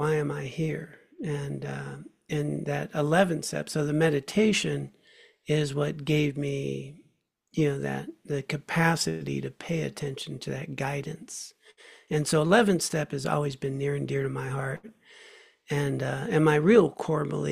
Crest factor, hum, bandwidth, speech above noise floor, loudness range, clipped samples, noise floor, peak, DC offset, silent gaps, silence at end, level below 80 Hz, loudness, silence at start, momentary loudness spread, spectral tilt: 20 dB; none; 15 kHz; 42 dB; 4 LU; under 0.1%; -69 dBFS; -8 dBFS; under 0.1%; none; 0 s; -60 dBFS; -28 LUFS; 0 s; 15 LU; -5.5 dB/octave